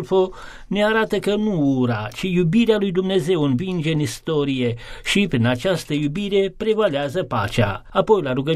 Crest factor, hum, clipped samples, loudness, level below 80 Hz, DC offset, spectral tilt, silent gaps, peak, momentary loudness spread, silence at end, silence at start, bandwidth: 16 dB; none; under 0.1%; -20 LUFS; -44 dBFS; under 0.1%; -6 dB/octave; none; -4 dBFS; 5 LU; 0 s; 0 s; 14.5 kHz